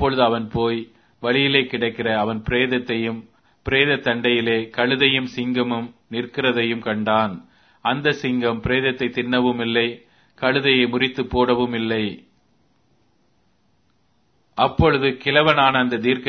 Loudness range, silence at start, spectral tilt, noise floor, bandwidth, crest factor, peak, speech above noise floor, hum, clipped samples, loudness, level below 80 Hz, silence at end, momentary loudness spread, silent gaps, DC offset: 5 LU; 0 s; -7 dB/octave; -64 dBFS; 6.4 kHz; 22 dB; 0 dBFS; 45 dB; none; under 0.1%; -20 LUFS; -44 dBFS; 0 s; 10 LU; none; under 0.1%